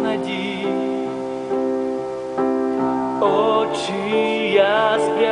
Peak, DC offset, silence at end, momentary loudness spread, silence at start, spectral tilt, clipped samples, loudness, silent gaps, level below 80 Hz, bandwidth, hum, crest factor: -2 dBFS; under 0.1%; 0 s; 8 LU; 0 s; -5 dB/octave; under 0.1%; -20 LUFS; none; -58 dBFS; 10 kHz; none; 16 dB